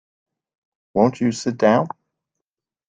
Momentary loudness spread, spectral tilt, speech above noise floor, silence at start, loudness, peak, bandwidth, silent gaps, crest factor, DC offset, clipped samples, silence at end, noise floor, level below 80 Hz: 12 LU; -6 dB/octave; 68 dB; 0.95 s; -19 LUFS; -2 dBFS; 9.4 kHz; none; 20 dB; under 0.1%; under 0.1%; 1 s; -86 dBFS; -60 dBFS